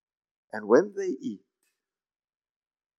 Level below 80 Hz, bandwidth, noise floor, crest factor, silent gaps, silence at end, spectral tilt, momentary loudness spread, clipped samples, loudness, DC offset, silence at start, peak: under -90 dBFS; 7.4 kHz; under -90 dBFS; 24 dB; none; 1.6 s; -6 dB/octave; 18 LU; under 0.1%; -26 LUFS; under 0.1%; 0.55 s; -8 dBFS